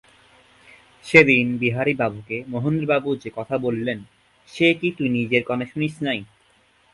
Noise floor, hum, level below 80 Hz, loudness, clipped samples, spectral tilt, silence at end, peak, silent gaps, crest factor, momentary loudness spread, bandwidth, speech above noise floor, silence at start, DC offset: -59 dBFS; none; -58 dBFS; -21 LUFS; under 0.1%; -6.5 dB/octave; 0.7 s; 0 dBFS; none; 22 dB; 14 LU; 11.5 kHz; 38 dB; 1.05 s; under 0.1%